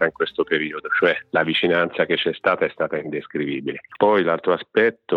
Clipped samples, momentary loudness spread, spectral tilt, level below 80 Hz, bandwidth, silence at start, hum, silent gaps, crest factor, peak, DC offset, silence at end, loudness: under 0.1%; 8 LU; -7 dB/octave; -66 dBFS; 5.4 kHz; 0 s; none; none; 18 dB; -4 dBFS; under 0.1%; 0 s; -21 LUFS